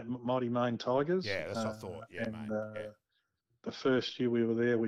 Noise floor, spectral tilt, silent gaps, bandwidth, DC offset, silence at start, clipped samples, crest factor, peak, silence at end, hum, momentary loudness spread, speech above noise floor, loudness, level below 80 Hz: -81 dBFS; -6.5 dB/octave; none; 11.5 kHz; under 0.1%; 0 s; under 0.1%; 14 dB; -20 dBFS; 0 s; none; 14 LU; 48 dB; -34 LUFS; -70 dBFS